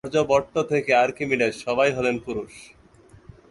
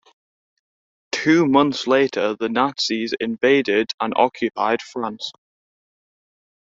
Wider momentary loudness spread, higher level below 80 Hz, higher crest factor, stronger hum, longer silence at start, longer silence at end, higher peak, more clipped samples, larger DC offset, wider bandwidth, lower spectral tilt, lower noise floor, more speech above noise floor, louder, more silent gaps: about the same, 11 LU vs 11 LU; first, -54 dBFS vs -64 dBFS; about the same, 18 dB vs 20 dB; neither; second, 0.05 s vs 1.15 s; second, 0.85 s vs 1.3 s; second, -6 dBFS vs -2 dBFS; neither; neither; first, 11.5 kHz vs 7.8 kHz; about the same, -5 dB/octave vs -4.5 dB/octave; second, -52 dBFS vs under -90 dBFS; second, 29 dB vs over 71 dB; about the same, -22 LUFS vs -20 LUFS; second, none vs 3.94-3.98 s